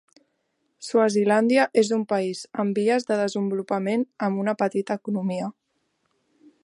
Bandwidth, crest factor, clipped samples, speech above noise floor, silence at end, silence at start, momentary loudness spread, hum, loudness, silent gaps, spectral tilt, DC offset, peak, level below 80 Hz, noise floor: 11.5 kHz; 18 dB; under 0.1%; 50 dB; 1.15 s; 0.8 s; 8 LU; none; -24 LUFS; none; -5.5 dB/octave; under 0.1%; -6 dBFS; -76 dBFS; -73 dBFS